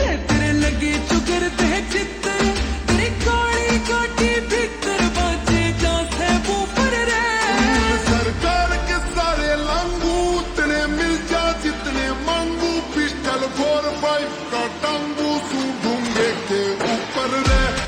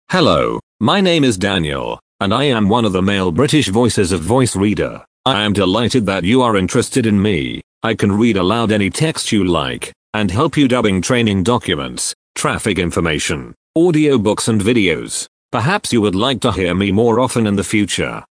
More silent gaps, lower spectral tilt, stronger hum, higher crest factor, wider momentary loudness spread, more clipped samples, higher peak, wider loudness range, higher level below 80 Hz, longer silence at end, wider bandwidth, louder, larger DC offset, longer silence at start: second, none vs 0.63-0.79 s, 2.02-2.19 s, 5.07-5.24 s, 7.63-7.81 s, 9.96-10.13 s, 12.15-12.35 s, 13.56-13.74 s, 15.28-15.49 s; about the same, -4 dB/octave vs -5 dB/octave; neither; about the same, 14 dB vs 16 dB; second, 4 LU vs 7 LU; neither; second, -6 dBFS vs 0 dBFS; about the same, 3 LU vs 1 LU; first, -28 dBFS vs -40 dBFS; about the same, 0 s vs 0.1 s; first, 16.5 kHz vs 10.5 kHz; second, -20 LUFS vs -15 LUFS; neither; about the same, 0 s vs 0.1 s